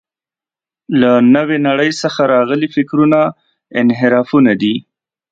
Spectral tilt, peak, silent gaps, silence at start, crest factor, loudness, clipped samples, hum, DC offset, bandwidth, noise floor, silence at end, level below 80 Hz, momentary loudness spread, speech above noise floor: -6.5 dB/octave; 0 dBFS; none; 0.9 s; 14 dB; -13 LUFS; under 0.1%; none; under 0.1%; 7.8 kHz; -90 dBFS; 0.5 s; -58 dBFS; 8 LU; 78 dB